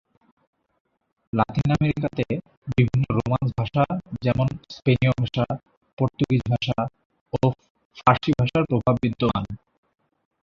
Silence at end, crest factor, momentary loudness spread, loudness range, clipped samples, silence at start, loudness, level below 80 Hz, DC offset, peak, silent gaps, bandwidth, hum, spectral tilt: 0.85 s; 22 dB; 8 LU; 1 LU; under 0.1%; 1.35 s; -24 LUFS; -46 dBFS; under 0.1%; -2 dBFS; 2.57-2.62 s, 5.77-5.81 s, 5.93-5.97 s, 7.05-7.10 s, 7.21-7.26 s, 7.70-7.75 s, 7.85-7.90 s; 7.2 kHz; none; -8.5 dB/octave